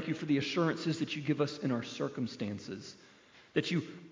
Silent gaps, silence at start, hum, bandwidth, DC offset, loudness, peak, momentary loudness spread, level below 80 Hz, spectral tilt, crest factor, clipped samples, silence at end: none; 0 s; none; 7.6 kHz; under 0.1%; -35 LUFS; -16 dBFS; 10 LU; -72 dBFS; -6 dB/octave; 20 dB; under 0.1%; 0 s